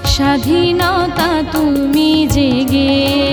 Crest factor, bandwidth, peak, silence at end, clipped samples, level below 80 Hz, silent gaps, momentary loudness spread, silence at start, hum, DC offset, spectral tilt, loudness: 10 dB; over 20 kHz; -2 dBFS; 0 s; under 0.1%; -28 dBFS; none; 3 LU; 0 s; none; under 0.1%; -5 dB/octave; -13 LUFS